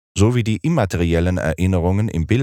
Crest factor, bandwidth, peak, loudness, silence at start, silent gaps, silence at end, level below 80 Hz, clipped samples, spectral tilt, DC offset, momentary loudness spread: 16 dB; 13 kHz; -2 dBFS; -19 LUFS; 0.15 s; none; 0 s; -38 dBFS; under 0.1%; -7 dB/octave; under 0.1%; 3 LU